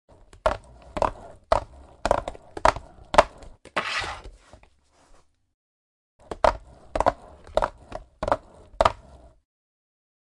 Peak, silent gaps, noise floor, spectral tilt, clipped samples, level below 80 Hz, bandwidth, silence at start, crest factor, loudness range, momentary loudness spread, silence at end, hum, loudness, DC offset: -4 dBFS; 5.54-6.19 s; -59 dBFS; -4 dB/octave; under 0.1%; -42 dBFS; 11.5 kHz; 0.45 s; 24 dB; 5 LU; 19 LU; 1.25 s; none; -26 LUFS; under 0.1%